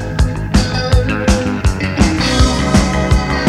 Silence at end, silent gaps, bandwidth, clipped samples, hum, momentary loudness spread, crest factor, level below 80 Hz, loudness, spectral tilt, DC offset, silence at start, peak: 0 s; none; 13 kHz; under 0.1%; none; 4 LU; 14 dB; -18 dBFS; -14 LUFS; -5.5 dB/octave; under 0.1%; 0 s; 0 dBFS